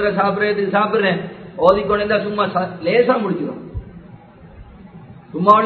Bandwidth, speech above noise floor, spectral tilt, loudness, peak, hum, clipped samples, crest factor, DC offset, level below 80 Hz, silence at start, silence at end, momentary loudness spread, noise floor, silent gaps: 6.6 kHz; 25 dB; -8 dB/octave; -17 LUFS; 0 dBFS; none; under 0.1%; 18 dB; under 0.1%; -44 dBFS; 0 s; 0 s; 16 LU; -41 dBFS; none